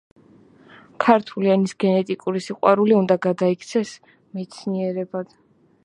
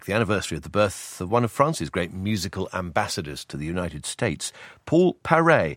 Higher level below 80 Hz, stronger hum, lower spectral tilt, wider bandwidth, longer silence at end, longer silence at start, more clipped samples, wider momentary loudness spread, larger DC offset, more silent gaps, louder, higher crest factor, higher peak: second, -70 dBFS vs -50 dBFS; neither; first, -7 dB/octave vs -5 dB/octave; second, 10.5 kHz vs 16.5 kHz; first, 0.6 s vs 0 s; first, 1 s vs 0 s; neither; first, 15 LU vs 11 LU; neither; neither; first, -21 LUFS vs -24 LUFS; about the same, 20 dB vs 22 dB; about the same, 0 dBFS vs -2 dBFS